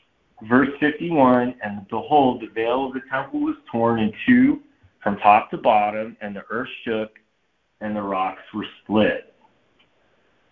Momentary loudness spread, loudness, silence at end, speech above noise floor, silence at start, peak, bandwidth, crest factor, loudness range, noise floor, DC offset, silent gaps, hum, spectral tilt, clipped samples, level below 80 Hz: 14 LU; -21 LUFS; 1.3 s; 49 dB; 0.4 s; 0 dBFS; 4.2 kHz; 20 dB; 7 LU; -69 dBFS; under 0.1%; none; none; -9 dB/octave; under 0.1%; -56 dBFS